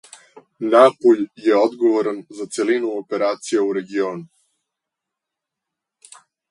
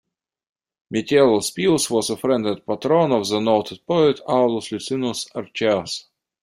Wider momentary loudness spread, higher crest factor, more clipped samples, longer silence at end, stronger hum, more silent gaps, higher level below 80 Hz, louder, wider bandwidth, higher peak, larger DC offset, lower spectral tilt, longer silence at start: first, 13 LU vs 10 LU; about the same, 20 dB vs 18 dB; neither; first, 2.25 s vs 0.4 s; neither; neither; second, -74 dBFS vs -60 dBFS; about the same, -18 LUFS vs -20 LUFS; second, 11 kHz vs 15.5 kHz; first, 0 dBFS vs -4 dBFS; neither; about the same, -5 dB/octave vs -4.5 dB/octave; second, 0.6 s vs 0.9 s